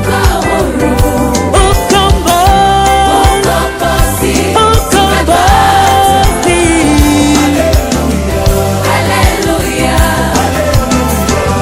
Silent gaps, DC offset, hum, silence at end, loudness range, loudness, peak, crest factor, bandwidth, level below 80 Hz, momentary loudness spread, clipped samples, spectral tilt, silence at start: none; under 0.1%; none; 0 s; 3 LU; -9 LUFS; 0 dBFS; 8 dB; 16.5 kHz; -16 dBFS; 4 LU; 1%; -4.5 dB/octave; 0 s